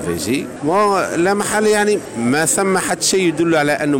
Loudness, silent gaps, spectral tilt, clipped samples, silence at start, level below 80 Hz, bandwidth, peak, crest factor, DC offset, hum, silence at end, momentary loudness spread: -16 LUFS; none; -3.5 dB/octave; under 0.1%; 0 s; -52 dBFS; 16.5 kHz; -8 dBFS; 10 dB; under 0.1%; none; 0 s; 5 LU